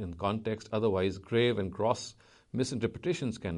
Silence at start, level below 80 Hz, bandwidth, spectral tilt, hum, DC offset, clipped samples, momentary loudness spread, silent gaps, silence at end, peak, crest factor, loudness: 0 s; -58 dBFS; 11.5 kHz; -6 dB/octave; none; under 0.1%; under 0.1%; 6 LU; none; 0 s; -12 dBFS; 20 dB; -32 LUFS